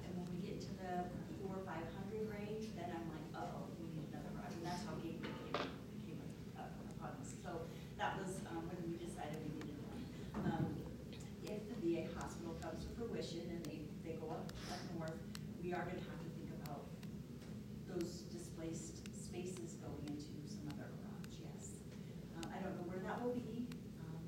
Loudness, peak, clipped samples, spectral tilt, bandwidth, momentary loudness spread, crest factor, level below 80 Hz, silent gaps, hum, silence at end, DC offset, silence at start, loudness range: -48 LUFS; -24 dBFS; under 0.1%; -6 dB/octave; 16 kHz; 8 LU; 24 dB; -64 dBFS; none; none; 0 s; under 0.1%; 0 s; 4 LU